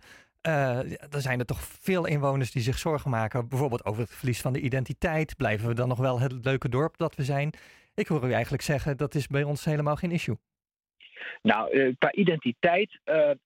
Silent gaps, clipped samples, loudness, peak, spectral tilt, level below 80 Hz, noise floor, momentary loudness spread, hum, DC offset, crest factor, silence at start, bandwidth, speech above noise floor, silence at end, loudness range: none; under 0.1%; -28 LUFS; -8 dBFS; -6.5 dB/octave; -50 dBFS; under -90 dBFS; 8 LU; none; under 0.1%; 20 dB; 0.1 s; 16.5 kHz; over 63 dB; 0.1 s; 2 LU